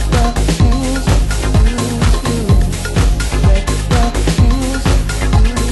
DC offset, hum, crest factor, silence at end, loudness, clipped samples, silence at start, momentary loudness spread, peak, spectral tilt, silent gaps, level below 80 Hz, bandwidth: under 0.1%; none; 12 dB; 0 s; -14 LUFS; under 0.1%; 0 s; 2 LU; 0 dBFS; -5.5 dB/octave; none; -14 dBFS; 12.5 kHz